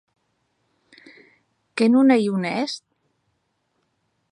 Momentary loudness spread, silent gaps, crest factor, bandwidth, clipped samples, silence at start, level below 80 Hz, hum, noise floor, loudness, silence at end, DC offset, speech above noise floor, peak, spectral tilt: 17 LU; none; 18 dB; 10.5 kHz; under 0.1%; 1.75 s; -76 dBFS; none; -72 dBFS; -19 LUFS; 1.55 s; under 0.1%; 53 dB; -6 dBFS; -6 dB/octave